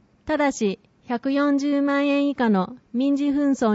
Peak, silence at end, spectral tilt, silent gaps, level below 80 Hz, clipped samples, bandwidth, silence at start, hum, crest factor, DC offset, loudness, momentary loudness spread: -8 dBFS; 0 s; -6 dB/octave; none; -58 dBFS; under 0.1%; 8 kHz; 0.25 s; none; 12 dB; under 0.1%; -22 LUFS; 7 LU